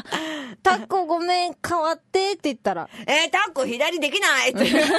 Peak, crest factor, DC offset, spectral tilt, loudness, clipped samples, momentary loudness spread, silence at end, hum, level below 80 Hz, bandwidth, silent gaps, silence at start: -6 dBFS; 16 dB; under 0.1%; -2.5 dB/octave; -22 LUFS; under 0.1%; 8 LU; 0 s; none; -62 dBFS; 12.5 kHz; none; 0.05 s